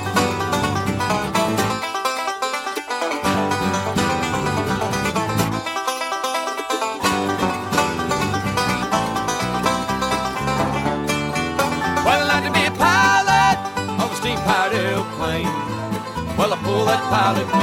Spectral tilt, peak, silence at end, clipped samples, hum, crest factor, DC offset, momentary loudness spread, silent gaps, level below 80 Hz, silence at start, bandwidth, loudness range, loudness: -4 dB/octave; -2 dBFS; 0 s; under 0.1%; none; 18 dB; under 0.1%; 7 LU; none; -44 dBFS; 0 s; 16.5 kHz; 4 LU; -20 LUFS